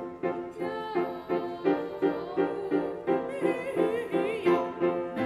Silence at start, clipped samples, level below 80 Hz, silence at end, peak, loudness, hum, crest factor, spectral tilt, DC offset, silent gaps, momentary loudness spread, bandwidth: 0 s; under 0.1%; -66 dBFS; 0 s; -14 dBFS; -30 LUFS; none; 16 dB; -7 dB/octave; under 0.1%; none; 7 LU; 13 kHz